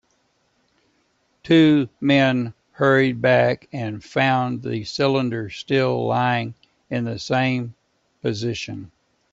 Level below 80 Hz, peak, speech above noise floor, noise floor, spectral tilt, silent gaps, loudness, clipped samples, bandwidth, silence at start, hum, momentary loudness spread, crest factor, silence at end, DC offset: -60 dBFS; -4 dBFS; 46 dB; -66 dBFS; -6.5 dB/octave; none; -21 LUFS; under 0.1%; 7.8 kHz; 1.45 s; none; 12 LU; 18 dB; 0.45 s; under 0.1%